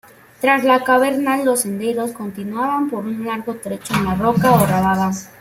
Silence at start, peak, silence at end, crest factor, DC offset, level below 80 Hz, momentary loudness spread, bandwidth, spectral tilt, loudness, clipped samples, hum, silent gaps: 0.4 s; -2 dBFS; 0.1 s; 16 dB; under 0.1%; -48 dBFS; 11 LU; 16.5 kHz; -5.5 dB/octave; -18 LUFS; under 0.1%; none; none